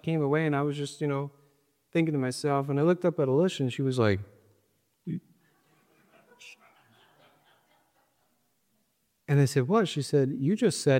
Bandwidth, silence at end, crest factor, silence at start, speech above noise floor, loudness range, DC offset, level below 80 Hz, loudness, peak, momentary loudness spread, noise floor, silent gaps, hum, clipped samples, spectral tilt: 15.5 kHz; 0 s; 18 dB; 0.05 s; 48 dB; 19 LU; under 0.1%; -72 dBFS; -27 LUFS; -10 dBFS; 13 LU; -74 dBFS; none; none; under 0.1%; -6.5 dB/octave